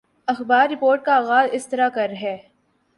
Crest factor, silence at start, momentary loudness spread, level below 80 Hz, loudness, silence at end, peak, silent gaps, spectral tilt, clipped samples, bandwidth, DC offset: 16 dB; 0.3 s; 12 LU; -70 dBFS; -19 LUFS; 0.6 s; -4 dBFS; none; -4 dB/octave; under 0.1%; 11.5 kHz; under 0.1%